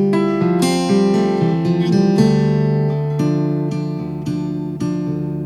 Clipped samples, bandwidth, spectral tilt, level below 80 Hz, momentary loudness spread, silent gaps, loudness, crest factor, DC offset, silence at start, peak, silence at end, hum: under 0.1%; 12.5 kHz; -7.5 dB/octave; -46 dBFS; 9 LU; none; -17 LUFS; 14 dB; under 0.1%; 0 s; -2 dBFS; 0 s; none